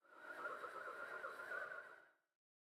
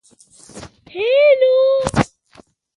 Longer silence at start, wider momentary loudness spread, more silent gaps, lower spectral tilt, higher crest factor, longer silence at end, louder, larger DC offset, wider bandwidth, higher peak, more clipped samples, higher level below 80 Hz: second, 0.05 s vs 0.55 s; second, 8 LU vs 17 LU; neither; second, -2.5 dB/octave vs -5 dB/octave; about the same, 16 dB vs 18 dB; second, 0.5 s vs 0.7 s; second, -50 LUFS vs -15 LUFS; neither; first, 15.5 kHz vs 11.5 kHz; second, -36 dBFS vs 0 dBFS; neither; second, under -90 dBFS vs -44 dBFS